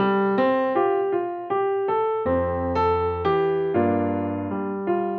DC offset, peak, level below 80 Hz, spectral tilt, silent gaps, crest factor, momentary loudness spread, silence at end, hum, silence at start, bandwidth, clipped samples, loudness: under 0.1%; -10 dBFS; -48 dBFS; -6 dB/octave; none; 12 dB; 6 LU; 0 s; none; 0 s; 5 kHz; under 0.1%; -23 LUFS